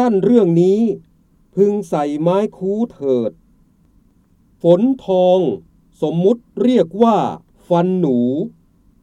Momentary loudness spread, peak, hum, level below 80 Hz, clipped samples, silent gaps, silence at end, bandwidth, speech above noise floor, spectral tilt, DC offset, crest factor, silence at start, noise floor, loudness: 11 LU; 0 dBFS; none; -56 dBFS; under 0.1%; none; 0.55 s; 11 kHz; 39 dB; -8.5 dB/octave; under 0.1%; 16 dB; 0 s; -54 dBFS; -16 LUFS